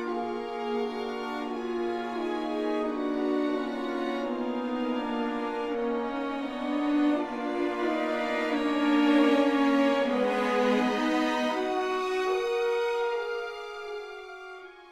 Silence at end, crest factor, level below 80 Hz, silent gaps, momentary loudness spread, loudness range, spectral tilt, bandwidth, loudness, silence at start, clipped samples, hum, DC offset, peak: 0 s; 16 dB; -62 dBFS; none; 10 LU; 6 LU; -4.5 dB/octave; 12.5 kHz; -28 LUFS; 0 s; under 0.1%; none; under 0.1%; -12 dBFS